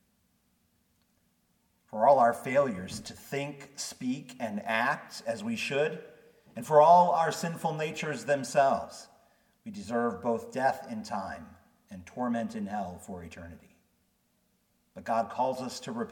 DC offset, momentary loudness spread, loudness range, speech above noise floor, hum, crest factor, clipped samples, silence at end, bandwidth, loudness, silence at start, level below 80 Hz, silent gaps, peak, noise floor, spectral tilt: under 0.1%; 21 LU; 11 LU; 43 dB; none; 22 dB; under 0.1%; 0 s; 18 kHz; -29 LUFS; 1.95 s; -68 dBFS; none; -8 dBFS; -73 dBFS; -5 dB/octave